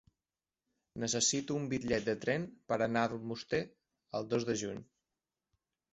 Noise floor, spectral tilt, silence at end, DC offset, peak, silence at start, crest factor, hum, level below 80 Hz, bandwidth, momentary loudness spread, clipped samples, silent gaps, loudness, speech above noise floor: under -90 dBFS; -4 dB/octave; 1.1 s; under 0.1%; -16 dBFS; 0.95 s; 20 dB; none; -66 dBFS; 8 kHz; 12 LU; under 0.1%; none; -35 LUFS; over 55 dB